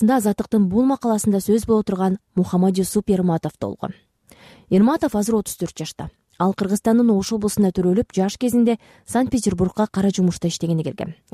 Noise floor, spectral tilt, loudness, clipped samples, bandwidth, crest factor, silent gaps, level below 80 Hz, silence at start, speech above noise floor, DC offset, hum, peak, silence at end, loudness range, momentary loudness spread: -49 dBFS; -6.5 dB/octave; -20 LUFS; under 0.1%; 14.5 kHz; 12 dB; none; -48 dBFS; 0 s; 30 dB; under 0.1%; none; -8 dBFS; 0.2 s; 3 LU; 11 LU